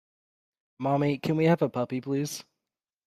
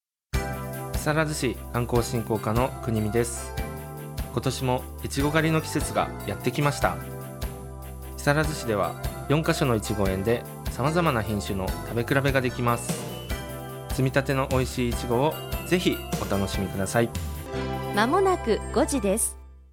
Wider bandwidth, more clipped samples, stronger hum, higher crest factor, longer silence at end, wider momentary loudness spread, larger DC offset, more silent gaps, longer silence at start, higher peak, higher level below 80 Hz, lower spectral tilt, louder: second, 15 kHz vs 18 kHz; neither; neither; about the same, 18 dB vs 20 dB; first, 0.65 s vs 0.1 s; about the same, 10 LU vs 10 LU; neither; neither; first, 0.8 s vs 0.35 s; second, -12 dBFS vs -6 dBFS; second, -70 dBFS vs -38 dBFS; first, -6.5 dB/octave vs -5 dB/octave; about the same, -27 LUFS vs -26 LUFS